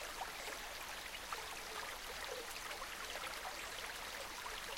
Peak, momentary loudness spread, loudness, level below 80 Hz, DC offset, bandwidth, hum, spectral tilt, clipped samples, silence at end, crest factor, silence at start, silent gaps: -28 dBFS; 1 LU; -45 LUFS; -62 dBFS; under 0.1%; 17 kHz; none; -0.5 dB/octave; under 0.1%; 0 s; 18 dB; 0 s; none